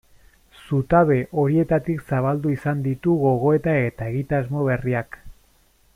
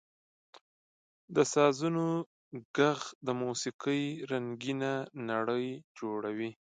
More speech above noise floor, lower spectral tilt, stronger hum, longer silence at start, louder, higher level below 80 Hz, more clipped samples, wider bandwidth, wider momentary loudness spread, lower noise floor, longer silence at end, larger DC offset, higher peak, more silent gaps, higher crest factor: second, 38 dB vs over 58 dB; first, -9.5 dB/octave vs -5 dB/octave; neither; second, 0.65 s vs 1.3 s; first, -21 LUFS vs -33 LUFS; first, -46 dBFS vs -80 dBFS; neither; first, 14.5 kHz vs 9.6 kHz; second, 8 LU vs 11 LU; second, -59 dBFS vs under -90 dBFS; first, 0.65 s vs 0.2 s; neither; first, -4 dBFS vs -12 dBFS; second, none vs 2.26-2.51 s, 2.65-2.74 s, 3.15-3.21 s, 3.74-3.79 s, 5.84-5.95 s; about the same, 18 dB vs 22 dB